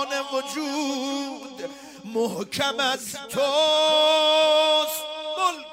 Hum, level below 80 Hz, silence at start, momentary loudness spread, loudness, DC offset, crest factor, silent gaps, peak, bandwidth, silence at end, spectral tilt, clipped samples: none; -70 dBFS; 0 s; 15 LU; -22 LUFS; under 0.1%; 16 dB; none; -8 dBFS; 16 kHz; 0 s; -2 dB/octave; under 0.1%